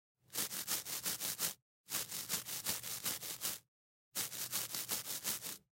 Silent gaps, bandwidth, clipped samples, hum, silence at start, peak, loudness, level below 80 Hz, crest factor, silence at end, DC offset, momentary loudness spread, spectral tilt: 1.62-1.84 s, 3.68-4.12 s; 16.5 kHz; under 0.1%; none; 0.3 s; -20 dBFS; -39 LUFS; -78 dBFS; 22 dB; 0.2 s; under 0.1%; 5 LU; 0 dB/octave